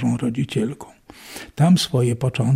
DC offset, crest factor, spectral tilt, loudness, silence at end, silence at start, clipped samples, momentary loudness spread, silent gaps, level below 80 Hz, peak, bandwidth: under 0.1%; 14 dB; -6.5 dB/octave; -20 LUFS; 0 s; 0 s; under 0.1%; 20 LU; none; -52 dBFS; -6 dBFS; 15.5 kHz